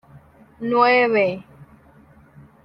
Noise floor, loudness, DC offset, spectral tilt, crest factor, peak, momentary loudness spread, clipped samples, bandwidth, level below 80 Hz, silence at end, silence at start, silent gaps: -50 dBFS; -18 LUFS; under 0.1%; -7 dB/octave; 20 dB; -4 dBFS; 16 LU; under 0.1%; 5.8 kHz; -62 dBFS; 1 s; 0.15 s; none